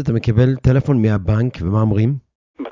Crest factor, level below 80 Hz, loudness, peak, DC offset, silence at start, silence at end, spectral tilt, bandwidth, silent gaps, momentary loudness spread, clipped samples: 14 dB; -34 dBFS; -17 LUFS; -4 dBFS; under 0.1%; 0 s; 0 s; -9.5 dB/octave; 7.2 kHz; 2.35-2.54 s; 5 LU; under 0.1%